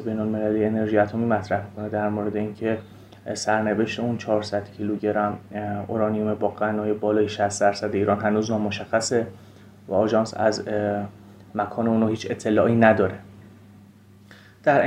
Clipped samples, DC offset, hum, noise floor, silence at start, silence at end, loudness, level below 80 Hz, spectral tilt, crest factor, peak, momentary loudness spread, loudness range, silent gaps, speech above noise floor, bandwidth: under 0.1%; under 0.1%; none; -50 dBFS; 0 s; 0 s; -24 LUFS; -62 dBFS; -6 dB/octave; 22 dB; -2 dBFS; 8 LU; 3 LU; none; 27 dB; 11 kHz